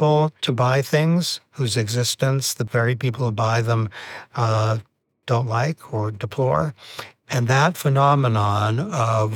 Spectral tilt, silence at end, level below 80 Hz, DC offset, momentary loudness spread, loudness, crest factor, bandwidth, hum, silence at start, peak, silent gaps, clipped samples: -5.5 dB/octave; 0 s; -60 dBFS; under 0.1%; 9 LU; -21 LUFS; 16 dB; 19.5 kHz; none; 0 s; -4 dBFS; none; under 0.1%